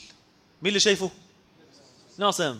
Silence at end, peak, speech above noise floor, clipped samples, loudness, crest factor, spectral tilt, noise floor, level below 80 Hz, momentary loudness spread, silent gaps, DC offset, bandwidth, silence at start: 0 s; -6 dBFS; 33 dB; under 0.1%; -24 LUFS; 22 dB; -2.5 dB/octave; -58 dBFS; -68 dBFS; 9 LU; none; under 0.1%; 15.5 kHz; 0 s